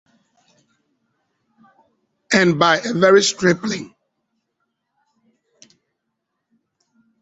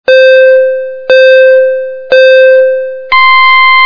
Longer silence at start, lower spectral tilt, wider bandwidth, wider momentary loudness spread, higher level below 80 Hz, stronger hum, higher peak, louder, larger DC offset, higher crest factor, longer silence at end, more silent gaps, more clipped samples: first, 2.3 s vs 0.1 s; first, -4 dB/octave vs -1.5 dB/octave; first, 8.2 kHz vs 5 kHz; first, 14 LU vs 9 LU; second, -62 dBFS vs -50 dBFS; neither; about the same, -2 dBFS vs 0 dBFS; second, -16 LUFS vs -4 LUFS; neither; first, 20 dB vs 4 dB; first, 3.35 s vs 0 s; neither; second, under 0.1% vs 1%